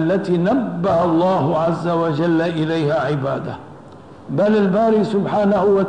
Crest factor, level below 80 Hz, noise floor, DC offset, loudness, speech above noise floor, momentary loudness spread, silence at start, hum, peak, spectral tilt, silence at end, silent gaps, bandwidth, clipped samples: 10 dB; -52 dBFS; -40 dBFS; 0.3%; -18 LUFS; 23 dB; 6 LU; 0 s; none; -8 dBFS; -8.5 dB/octave; 0 s; none; 9.6 kHz; under 0.1%